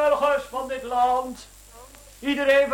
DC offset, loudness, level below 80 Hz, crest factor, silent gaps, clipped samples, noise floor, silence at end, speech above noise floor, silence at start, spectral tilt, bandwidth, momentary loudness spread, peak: under 0.1%; -23 LUFS; -52 dBFS; 18 dB; none; under 0.1%; -47 dBFS; 0 s; 23 dB; 0 s; -3 dB/octave; 17 kHz; 13 LU; -6 dBFS